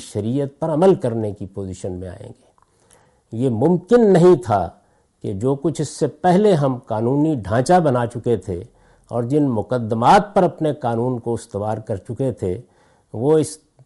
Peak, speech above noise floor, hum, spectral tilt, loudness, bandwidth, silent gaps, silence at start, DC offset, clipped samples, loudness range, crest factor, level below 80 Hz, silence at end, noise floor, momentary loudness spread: -4 dBFS; 37 dB; none; -7.5 dB/octave; -19 LUFS; 11.5 kHz; none; 0 s; under 0.1%; under 0.1%; 5 LU; 14 dB; -54 dBFS; 0.3 s; -55 dBFS; 16 LU